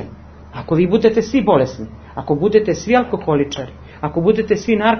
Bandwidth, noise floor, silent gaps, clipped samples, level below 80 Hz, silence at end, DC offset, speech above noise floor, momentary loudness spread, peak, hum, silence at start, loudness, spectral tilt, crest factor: 6.6 kHz; -37 dBFS; none; under 0.1%; -40 dBFS; 0 s; under 0.1%; 21 dB; 17 LU; 0 dBFS; none; 0 s; -16 LUFS; -6.5 dB/octave; 16 dB